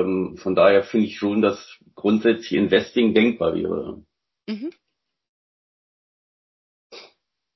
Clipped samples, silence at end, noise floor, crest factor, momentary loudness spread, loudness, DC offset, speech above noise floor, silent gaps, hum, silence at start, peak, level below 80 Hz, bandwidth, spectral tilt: under 0.1%; 0.55 s; -59 dBFS; 20 dB; 17 LU; -21 LUFS; under 0.1%; 39 dB; 5.29-6.90 s; none; 0 s; -4 dBFS; -56 dBFS; 6 kHz; -6.5 dB/octave